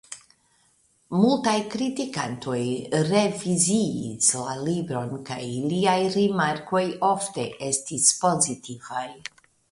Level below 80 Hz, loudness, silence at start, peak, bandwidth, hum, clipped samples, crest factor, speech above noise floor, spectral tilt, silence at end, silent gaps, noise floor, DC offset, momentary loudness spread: -64 dBFS; -24 LUFS; 0.1 s; -4 dBFS; 11.5 kHz; none; under 0.1%; 20 dB; 40 dB; -4 dB/octave; 0.55 s; none; -64 dBFS; under 0.1%; 12 LU